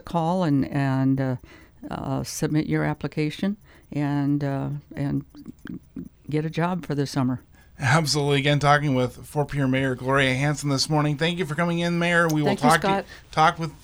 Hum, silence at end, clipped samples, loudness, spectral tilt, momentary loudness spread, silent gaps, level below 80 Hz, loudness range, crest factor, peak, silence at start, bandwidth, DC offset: none; 0.05 s; under 0.1%; -23 LUFS; -5.5 dB/octave; 14 LU; none; -50 dBFS; 6 LU; 20 dB; -4 dBFS; 0.05 s; over 20 kHz; under 0.1%